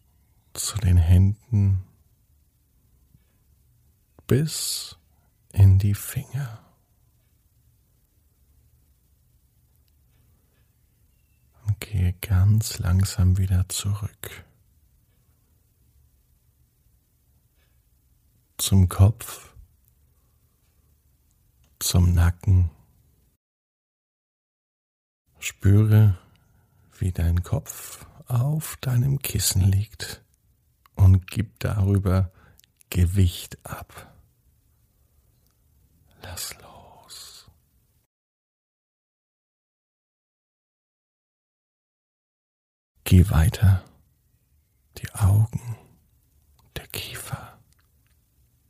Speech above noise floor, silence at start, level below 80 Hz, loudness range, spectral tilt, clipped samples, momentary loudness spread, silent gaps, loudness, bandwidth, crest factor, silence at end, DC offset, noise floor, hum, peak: 44 dB; 0.55 s; -40 dBFS; 16 LU; -5.5 dB/octave; under 0.1%; 21 LU; 23.37-25.25 s, 38.06-42.95 s; -23 LUFS; 15.5 kHz; 22 dB; 1.25 s; under 0.1%; -65 dBFS; none; -4 dBFS